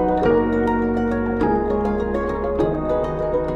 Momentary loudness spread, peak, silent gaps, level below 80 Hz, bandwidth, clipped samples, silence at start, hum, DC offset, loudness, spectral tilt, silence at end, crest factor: 5 LU; -6 dBFS; none; -34 dBFS; 7.8 kHz; under 0.1%; 0 s; none; under 0.1%; -21 LUFS; -9 dB/octave; 0 s; 12 dB